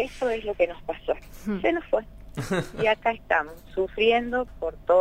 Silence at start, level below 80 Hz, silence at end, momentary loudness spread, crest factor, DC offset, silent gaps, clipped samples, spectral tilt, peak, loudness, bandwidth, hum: 0 s; -46 dBFS; 0 s; 10 LU; 18 dB; under 0.1%; none; under 0.1%; -5.5 dB/octave; -8 dBFS; -26 LUFS; 16 kHz; none